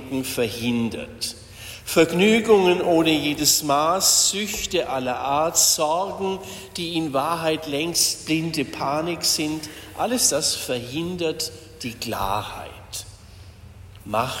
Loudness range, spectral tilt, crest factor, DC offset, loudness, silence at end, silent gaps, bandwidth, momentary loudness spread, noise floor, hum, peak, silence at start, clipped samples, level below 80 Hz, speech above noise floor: 8 LU; -2.5 dB/octave; 20 dB; under 0.1%; -21 LUFS; 0 s; none; 16.5 kHz; 16 LU; -44 dBFS; none; -4 dBFS; 0 s; under 0.1%; -50 dBFS; 22 dB